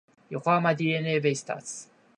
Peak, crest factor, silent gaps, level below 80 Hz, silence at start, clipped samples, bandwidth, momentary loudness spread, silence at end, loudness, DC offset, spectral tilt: -8 dBFS; 20 dB; none; -74 dBFS; 0.3 s; under 0.1%; 11 kHz; 15 LU; 0.35 s; -26 LUFS; under 0.1%; -5 dB/octave